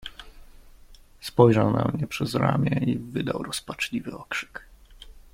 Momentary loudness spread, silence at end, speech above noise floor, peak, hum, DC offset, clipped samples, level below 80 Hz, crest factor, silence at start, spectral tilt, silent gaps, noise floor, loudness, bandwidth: 16 LU; 0.15 s; 26 dB; -2 dBFS; none; under 0.1%; under 0.1%; -50 dBFS; 24 dB; 0 s; -6.5 dB/octave; none; -50 dBFS; -25 LUFS; 16.5 kHz